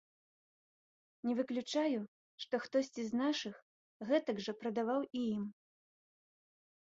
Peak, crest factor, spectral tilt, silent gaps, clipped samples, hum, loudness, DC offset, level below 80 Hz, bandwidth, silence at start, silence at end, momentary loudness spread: -20 dBFS; 20 dB; -4 dB/octave; 2.08-2.38 s, 3.62-4.00 s; under 0.1%; none; -38 LUFS; under 0.1%; -82 dBFS; 7.6 kHz; 1.25 s; 1.35 s; 11 LU